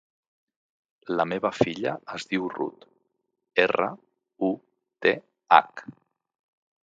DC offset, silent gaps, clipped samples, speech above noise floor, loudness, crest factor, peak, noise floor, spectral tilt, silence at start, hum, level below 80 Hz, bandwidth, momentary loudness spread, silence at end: under 0.1%; none; under 0.1%; 52 dB; -26 LUFS; 28 dB; 0 dBFS; -77 dBFS; -5.5 dB/octave; 1.05 s; none; -68 dBFS; 9 kHz; 15 LU; 0.9 s